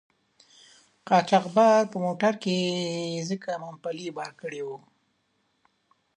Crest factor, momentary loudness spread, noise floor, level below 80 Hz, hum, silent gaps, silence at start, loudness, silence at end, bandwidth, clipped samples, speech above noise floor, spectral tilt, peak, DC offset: 22 dB; 16 LU; -72 dBFS; -78 dBFS; none; none; 1.05 s; -26 LUFS; 1.4 s; 10.5 kHz; under 0.1%; 47 dB; -5 dB/octave; -6 dBFS; under 0.1%